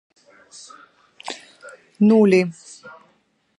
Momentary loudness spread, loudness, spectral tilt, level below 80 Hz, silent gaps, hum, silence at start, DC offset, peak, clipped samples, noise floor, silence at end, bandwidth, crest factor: 27 LU; -17 LUFS; -6.5 dB/octave; -70 dBFS; none; none; 1.25 s; under 0.1%; -4 dBFS; under 0.1%; -63 dBFS; 0.7 s; 11 kHz; 18 dB